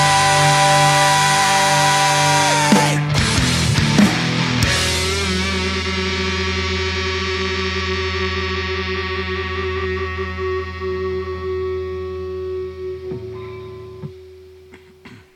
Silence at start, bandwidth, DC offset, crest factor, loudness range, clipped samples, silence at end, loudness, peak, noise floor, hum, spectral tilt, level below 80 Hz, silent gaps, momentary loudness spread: 0 s; 15.5 kHz; under 0.1%; 18 dB; 13 LU; under 0.1%; 0.15 s; -17 LUFS; 0 dBFS; -44 dBFS; none; -3.5 dB/octave; -34 dBFS; none; 15 LU